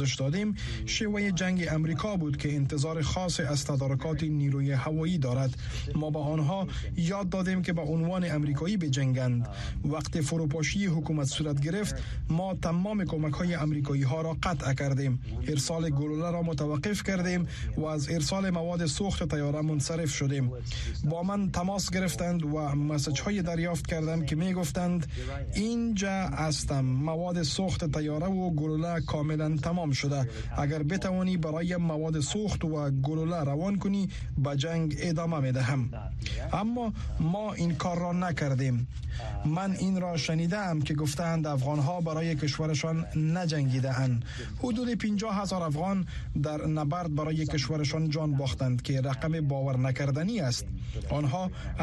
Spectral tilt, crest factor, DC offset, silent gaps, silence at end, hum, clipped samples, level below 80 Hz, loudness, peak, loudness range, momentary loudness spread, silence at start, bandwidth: -6 dB/octave; 16 dB; under 0.1%; none; 0 s; none; under 0.1%; -42 dBFS; -30 LUFS; -14 dBFS; 1 LU; 4 LU; 0 s; 12 kHz